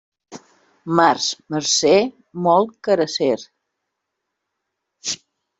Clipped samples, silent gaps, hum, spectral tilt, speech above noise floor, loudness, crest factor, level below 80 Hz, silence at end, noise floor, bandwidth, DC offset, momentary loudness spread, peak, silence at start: under 0.1%; none; none; -3.5 dB/octave; 61 dB; -19 LUFS; 20 dB; -64 dBFS; 0.45 s; -79 dBFS; 8.2 kHz; under 0.1%; 12 LU; 0 dBFS; 0.3 s